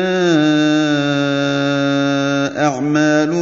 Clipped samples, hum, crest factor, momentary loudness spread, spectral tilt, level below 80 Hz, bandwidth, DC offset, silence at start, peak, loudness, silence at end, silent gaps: under 0.1%; none; 14 dB; 3 LU; -5.5 dB/octave; -62 dBFS; 7.6 kHz; 0.1%; 0 s; -2 dBFS; -15 LUFS; 0 s; none